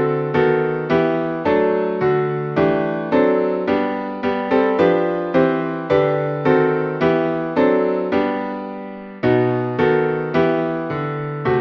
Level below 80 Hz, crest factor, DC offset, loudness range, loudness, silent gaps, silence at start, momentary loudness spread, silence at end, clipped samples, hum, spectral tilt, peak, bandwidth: -52 dBFS; 16 dB; under 0.1%; 2 LU; -18 LUFS; none; 0 s; 7 LU; 0 s; under 0.1%; none; -9 dB/octave; -2 dBFS; 6.2 kHz